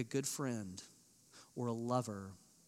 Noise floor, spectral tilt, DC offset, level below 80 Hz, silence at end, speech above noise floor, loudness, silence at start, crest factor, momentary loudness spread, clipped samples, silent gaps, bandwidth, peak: -64 dBFS; -5 dB/octave; under 0.1%; -86 dBFS; 0.3 s; 23 dB; -41 LUFS; 0 s; 22 dB; 21 LU; under 0.1%; none; 16 kHz; -20 dBFS